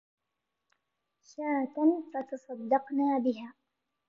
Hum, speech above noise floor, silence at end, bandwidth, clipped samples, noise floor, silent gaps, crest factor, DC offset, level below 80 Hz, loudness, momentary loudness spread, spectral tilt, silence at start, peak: none; 55 dB; 0.6 s; 7.2 kHz; under 0.1%; -86 dBFS; none; 18 dB; under 0.1%; -88 dBFS; -31 LUFS; 13 LU; -6.5 dB/octave; 1.4 s; -14 dBFS